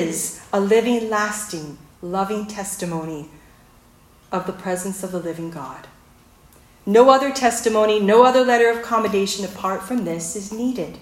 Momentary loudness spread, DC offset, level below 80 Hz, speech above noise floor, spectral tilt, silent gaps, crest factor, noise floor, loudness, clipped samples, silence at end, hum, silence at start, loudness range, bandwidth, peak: 18 LU; under 0.1%; -56 dBFS; 32 dB; -4 dB/octave; none; 20 dB; -51 dBFS; -20 LUFS; under 0.1%; 0.05 s; none; 0 s; 13 LU; 16.5 kHz; 0 dBFS